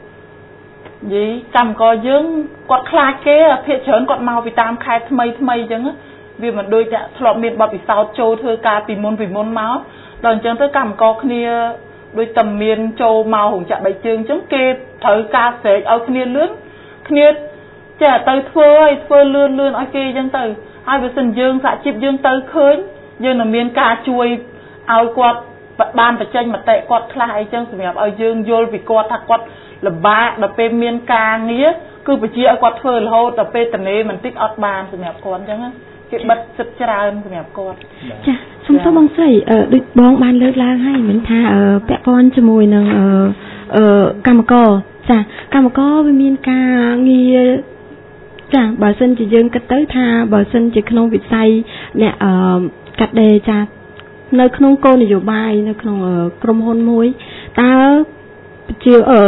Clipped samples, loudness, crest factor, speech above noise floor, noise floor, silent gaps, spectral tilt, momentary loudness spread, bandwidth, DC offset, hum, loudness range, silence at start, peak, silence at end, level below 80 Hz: under 0.1%; -13 LUFS; 12 dB; 27 dB; -39 dBFS; none; -10.5 dB/octave; 12 LU; 4.1 kHz; under 0.1%; none; 6 LU; 0.05 s; 0 dBFS; 0 s; -44 dBFS